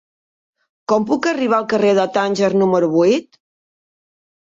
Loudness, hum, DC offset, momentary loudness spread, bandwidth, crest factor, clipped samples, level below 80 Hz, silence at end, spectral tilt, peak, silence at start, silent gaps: -16 LUFS; none; under 0.1%; 5 LU; 7.8 kHz; 14 dB; under 0.1%; -64 dBFS; 1.2 s; -6 dB/octave; -4 dBFS; 0.9 s; none